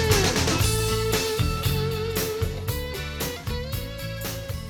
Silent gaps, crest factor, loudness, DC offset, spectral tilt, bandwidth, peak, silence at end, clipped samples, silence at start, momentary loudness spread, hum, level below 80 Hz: none; 18 dB; -26 LUFS; under 0.1%; -4 dB/octave; over 20 kHz; -8 dBFS; 0 s; under 0.1%; 0 s; 10 LU; none; -34 dBFS